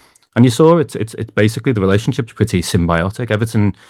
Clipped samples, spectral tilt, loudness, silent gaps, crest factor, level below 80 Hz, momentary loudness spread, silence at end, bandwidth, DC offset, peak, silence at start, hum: under 0.1%; -6.5 dB/octave; -15 LUFS; none; 14 dB; -40 dBFS; 10 LU; 0.2 s; 14.5 kHz; under 0.1%; 0 dBFS; 0.35 s; none